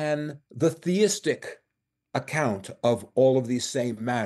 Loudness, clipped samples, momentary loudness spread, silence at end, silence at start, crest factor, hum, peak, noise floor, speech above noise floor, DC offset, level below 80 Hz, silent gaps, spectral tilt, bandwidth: -26 LUFS; under 0.1%; 12 LU; 0 s; 0 s; 16 dB; none; -10 dBFS; -81 dBFS; 56 dB; under 0.1%; -70 dBFS; none; -5 dB/octave; 12.5 kHz